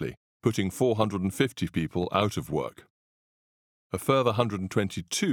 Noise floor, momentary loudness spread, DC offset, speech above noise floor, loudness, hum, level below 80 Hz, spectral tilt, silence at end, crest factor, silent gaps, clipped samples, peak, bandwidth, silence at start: under -90 dBFS; 8 LU; under 0.1%; over 63 dB; -28 LUFS; none; -56 dBFS; -5.5 dB/octave; 0 s; 22 dB; 0.17-0.40 s, 2.90-3.90 s; under 0.1%; -6 dBFS; 19.5 kHz; 0 s